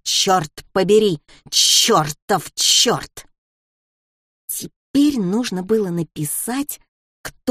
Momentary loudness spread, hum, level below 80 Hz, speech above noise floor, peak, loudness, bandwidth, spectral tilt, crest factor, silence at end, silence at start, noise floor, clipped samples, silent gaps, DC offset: 16 LU; none; -54 dBFS; over 72 dB; -2 dBFS; -17 LUFS; 15.5 kHz; -2.5 dB/octave; 18 dB; 0 s; 0.05 s; under -90 dBFS; under 0.1%; 2.22-2.28 s, 3.38-4.48 s, 4.76-4.94 s, 6.88-7.24 s; under 0.1%